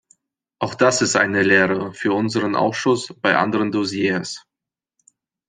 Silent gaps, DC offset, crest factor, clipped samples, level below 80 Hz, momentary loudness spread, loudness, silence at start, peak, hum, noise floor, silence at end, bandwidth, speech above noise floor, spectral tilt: none; under 0.1%; 18 dB; under 0.1%; -62 dBFS; 10 LU; -19 LUFS; 0.6 s; -2 dBFS; none; -87 dBFS; 1.1 s; 9.8 kHz; 68 dB; -4 dB/octave